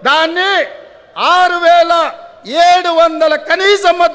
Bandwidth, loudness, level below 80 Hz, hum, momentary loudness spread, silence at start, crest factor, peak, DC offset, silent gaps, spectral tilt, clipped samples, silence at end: 8 kHz; -11 LUFS; -54 dBFS; none; 10 LU; 0 s; 10 dB; 0 dBFS; under 0.1%; none; -1.5 dB/octave; under 0.1%; 0 s